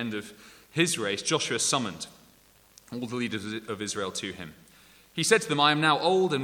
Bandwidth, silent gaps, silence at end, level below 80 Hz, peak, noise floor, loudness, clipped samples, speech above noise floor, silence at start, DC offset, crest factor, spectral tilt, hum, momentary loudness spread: 19 kHz; none; 0 s; -68 dBFS; -6 dBFS; -59 dBFS; -27 LUFS; under 0.1%; 31 dB; 0 s; under 0.1%; 22 dB; -3 dB/octave; none; 18 LU